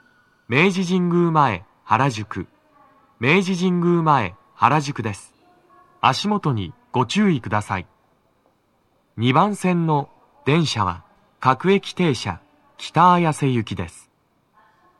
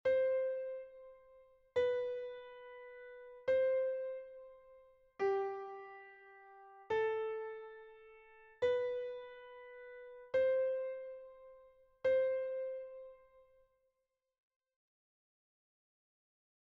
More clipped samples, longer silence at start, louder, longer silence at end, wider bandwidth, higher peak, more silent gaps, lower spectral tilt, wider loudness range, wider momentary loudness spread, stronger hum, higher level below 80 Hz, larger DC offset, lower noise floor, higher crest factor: neither; first, 0.5 s vs 0.05 s; first, -20 LUFS vs -38 LUFS; second, 1.1 s vs 3.6 s; first, 12 kHz vs 6 kHz; first, 0 dBFS vs -24 dBFS; neither; first, -6 dB/octave vs -2.5 dB/octave; about the same, 3 LU vs 4 LU; second, 13 LU vs 24 LU; neither; first, -58 dBFS vs -78 dBFS; neither; second, -64 dBFS vs -87 dBFS; about the same, 20 dB vs 16 dB